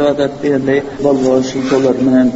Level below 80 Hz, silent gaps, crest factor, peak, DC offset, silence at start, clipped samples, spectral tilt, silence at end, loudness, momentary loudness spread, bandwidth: -46 dBFS; none; 12 dB; 0 dBFS; under 0.1%; 0 s; under 0.1%; -6 dB/octave; 0 s; -13 LUFS; 4 LU; 8 kHz